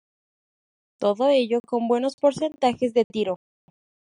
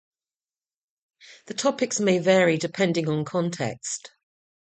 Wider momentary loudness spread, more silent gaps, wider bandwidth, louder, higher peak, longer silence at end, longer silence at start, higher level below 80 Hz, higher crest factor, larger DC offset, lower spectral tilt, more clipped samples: second, 7 LU vs 12 LU; first, 1.60-1.64 s, 2.14-2.18 s, 3.04-3.10 s vs none; first, 10.5 kHz vs 9.2 kHz; about the same, -23 LUFS vs -24 LUFS; about the same, -6 dBFS vs -6 dBFS; about the same, 0.7 s vs 0.65 s; second, 1 s vs 1.3 s; about the same, -70 dBFS vs -68 dBFS; about the same, 18 dB vs 20 dB; neither; about the same, -5.5 dB/octave vs -4.5 dB/octave; neither